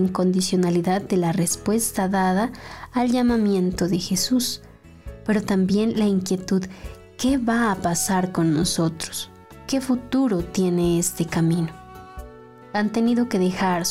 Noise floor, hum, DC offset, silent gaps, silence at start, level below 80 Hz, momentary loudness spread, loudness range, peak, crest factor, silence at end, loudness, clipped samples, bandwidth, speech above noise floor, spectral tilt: -43 dBFS; none; 0.2%; none; 0 s; -46 dBFS; 12 LU; 2 LU; -10 dBFS; 12 dB; 0 s; -22 LUFS; under 0.1%; 16 kHz; 22 dB; -5 dB/octave